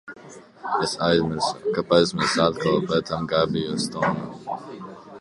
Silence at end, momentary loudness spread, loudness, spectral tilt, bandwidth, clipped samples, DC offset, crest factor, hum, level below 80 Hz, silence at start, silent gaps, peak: 0 s; 17 LU; -23 LUFS; -5 dB/octave; 11.5 kHz; under 0.1%; under 0.1%; 20 dB; none; -54 dBFS; 0.05 s; none; -4 dBFS